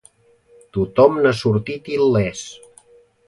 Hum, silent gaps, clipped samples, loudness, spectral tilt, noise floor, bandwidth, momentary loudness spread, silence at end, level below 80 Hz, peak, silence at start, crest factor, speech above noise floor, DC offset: none; none; under 0.1%; -18 LUFS; -6.5 dB/octave; -54 dBFS; 11.5 kHz; 15 LU; 0.75 s; -48 dBFS; 0 dBFS; 0.75 s; 20 dB; 37 dB; under 0.1%